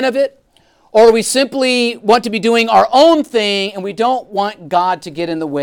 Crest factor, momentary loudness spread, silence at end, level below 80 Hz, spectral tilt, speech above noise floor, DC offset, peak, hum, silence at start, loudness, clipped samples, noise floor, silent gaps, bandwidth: 12 dB; 10 LU; 0 s; -54 dBFS; -3.5 dB/octave; 40 dB; under 0.1%; 0 dBFS; none; 0 s; -13 LUFS; under 0.1%; -53 dBFS; none; 18 kHz